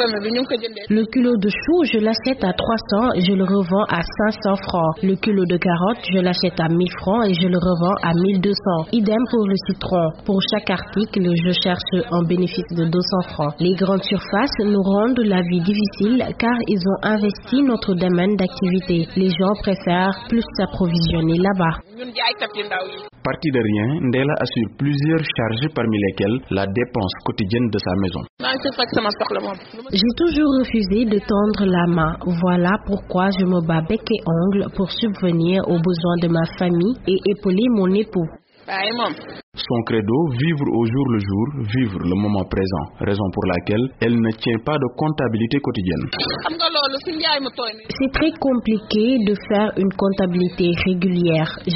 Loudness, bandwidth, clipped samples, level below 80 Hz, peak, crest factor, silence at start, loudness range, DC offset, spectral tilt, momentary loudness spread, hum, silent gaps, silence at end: -19 LUFS; 6 kHz; under 0.1%; -42 dBFS; -4 dBFS; 14 dB; 0 s; 2 LU; under 0.1%; -5 dB/octave; 5 LU; none; 28.30-28.37 s, 39.43-39.52 s; 0 s